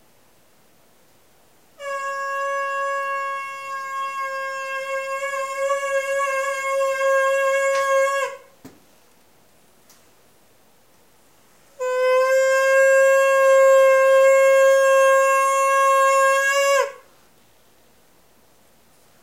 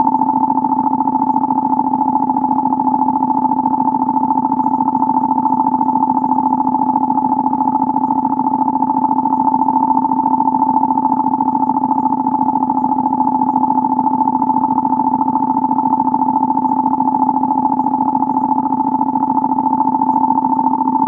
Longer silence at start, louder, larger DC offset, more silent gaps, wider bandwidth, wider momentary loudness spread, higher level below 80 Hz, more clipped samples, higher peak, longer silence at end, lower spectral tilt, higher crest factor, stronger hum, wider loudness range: first, 1.8 s vs 0 s; second, -18 LUFS vs -15 LUFS; first, 0.1% vs under 0.1%; neither; first, 16 kHz vs 2.6 kHz; first, 13 LU vs 1 LU; second, -72 dBFS vs -56 dBFS; neither; second, -6 dBFS vs 0 dBFS; first, 2.25 s vs 0 s; second, 1 dB/octave vs -11.5 dB/octave; about the same, 14 dB vs 14 dB; neither; first, 12 LU vs 1 LU